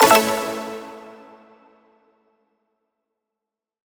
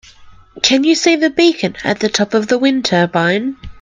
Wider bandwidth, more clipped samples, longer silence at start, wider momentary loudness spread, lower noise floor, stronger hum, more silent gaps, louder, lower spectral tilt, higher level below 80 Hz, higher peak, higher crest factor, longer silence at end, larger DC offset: first, over 20 kHz vs 9.6 kHz; neither; second, 0 s vs 0.2 s; first, 26 LU vs 6 LU; first, -86 dBFS vs -40 dBFS; neither; neither; second, -20 LUFS vs -14 LUFS; second, -2 dB/octave vs -4 dB/octave; second, -60 dBFS vs -46 dBFS; about the same, 0 dBFS vs 0 dBFS; first, 24 dB vs 14 dB; first, 2.85 s vs 0 s; neither